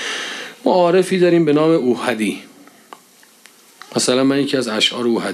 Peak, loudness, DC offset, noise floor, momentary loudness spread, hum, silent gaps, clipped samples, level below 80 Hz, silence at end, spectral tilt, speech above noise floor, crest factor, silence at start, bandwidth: -2 dBFS; -16 LUFS; under 0.1%; -49 dBFS; 10 LU; none; none; under 0.1%; -70 dBFS; 0 s; -4.5 dB/octave; 33 dB; 16 dB; 0 s; 14 kHz